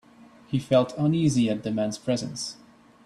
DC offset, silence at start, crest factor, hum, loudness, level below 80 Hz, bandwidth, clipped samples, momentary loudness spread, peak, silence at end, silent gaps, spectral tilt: under 0.1%; 0.2 s; 18 dB; none; -26 LUFS; -62 dBFS; 12.5 kHz; under 0.1%; 10 LU; -8 dBFS; 0.5 s; none; -6 dB/octave